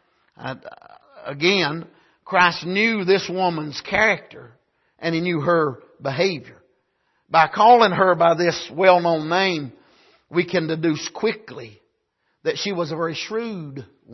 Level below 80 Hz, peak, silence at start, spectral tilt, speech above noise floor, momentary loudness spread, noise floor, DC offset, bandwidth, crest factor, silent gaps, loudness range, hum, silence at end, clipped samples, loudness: -60 dBFS; -2 dBFS; 0.4 s; -5 dB/octave; 51 dB; 18 LU; -71 dBFS; under 0.1%; 6.2 kHz; 20 dB; none; 8 LU; none; 0 s; under 0.1%; -20 LUFS